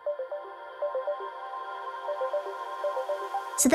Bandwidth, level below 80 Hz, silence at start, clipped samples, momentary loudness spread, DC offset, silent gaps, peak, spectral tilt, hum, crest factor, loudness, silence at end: 16 kHz; -68 dBFS; 0 s; under 0.1%; 6 LU; under 0.1%; none; -8 dBFS; -2 dB/octave; none; 24 dB; -33 LUFS; 0 s